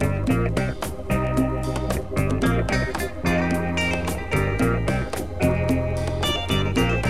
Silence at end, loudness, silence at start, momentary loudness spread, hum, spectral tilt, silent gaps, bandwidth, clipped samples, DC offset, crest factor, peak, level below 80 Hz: 0 s; -23 LUFS; 0 s; 5 LU; none; -6 dB/octave; none; 16 kHz; under 0.1%; 1%; 16 dB; -8 dBFS; -32 dBFS